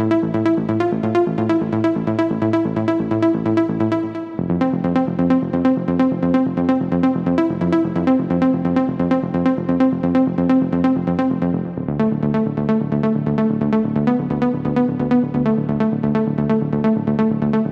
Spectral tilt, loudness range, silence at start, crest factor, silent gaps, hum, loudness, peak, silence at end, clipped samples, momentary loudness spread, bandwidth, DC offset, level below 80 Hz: -9.5 dB/octave; 1 LU; 0 s; 14 dB; none; none; -18 LUFS; -4 dBFS; 0 s; under 0.1%; 2 LU; 6.4 kHz; under 0.1%; -46 dBFS